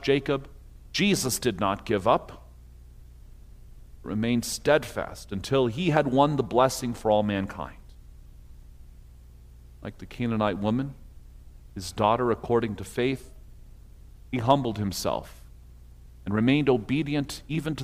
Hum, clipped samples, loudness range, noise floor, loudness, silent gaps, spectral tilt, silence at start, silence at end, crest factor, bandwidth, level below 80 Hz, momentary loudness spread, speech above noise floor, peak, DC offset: 60 Hz at -50 dBFS; under 0.1%; 8 LU; -48 dBFS; -26 LUFS; none; -5.5 dB/octave; 0 s; 0 s; 22 dB; 15.5 kHz; -48 dBFS; 14 LU; 23 dB; -6 dBFS; under 0.1%